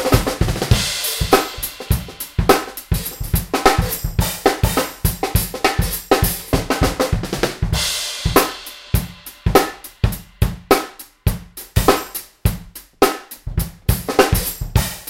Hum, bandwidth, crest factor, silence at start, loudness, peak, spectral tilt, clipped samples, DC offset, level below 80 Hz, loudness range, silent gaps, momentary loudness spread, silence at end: none; 17 kHz; 18 dB; 0 s; -19 LUFS; 0 dBFS; -4.5 dB/octave; under 0.1%; under 0.1%; -26 dBFS; 2 LU; none; 9 LU; 0 s